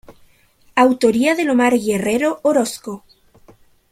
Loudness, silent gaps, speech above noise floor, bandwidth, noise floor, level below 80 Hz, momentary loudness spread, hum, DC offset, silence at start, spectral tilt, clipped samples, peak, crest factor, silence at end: -16 LUFS; none; 37 dB; 15.5 kHz; -53 dBFS; -56 dBFS; 13 LU; none; under 0.1%; 0.1 s; -4.5 dB/octave; under 0.1%; -2 dBFS; 16 dB; 0.95 s